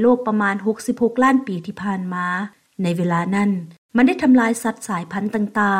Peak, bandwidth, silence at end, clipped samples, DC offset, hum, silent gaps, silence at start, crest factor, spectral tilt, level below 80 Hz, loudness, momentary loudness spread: -4 dBFS; 15 kHz; 0 s; under 0.1%; under 0.1%; none; 3.78-3.89 s; 0 s; 16 dB; -6.5 dB/octave; -62 dBFS; -20 LUFS; 11 LU